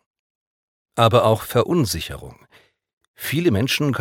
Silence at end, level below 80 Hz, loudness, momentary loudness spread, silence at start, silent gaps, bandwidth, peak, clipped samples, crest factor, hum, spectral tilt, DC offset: 0 s; -48 dBFS; -19 LUFS; 15 LU; 0.95 s; 2.93-3.01 s, 3.08-3.14 s; 17.5 kHz; 0 dBFS; under 0.1%; 20 dB; none; -5.5 dB/octave; under 0.1%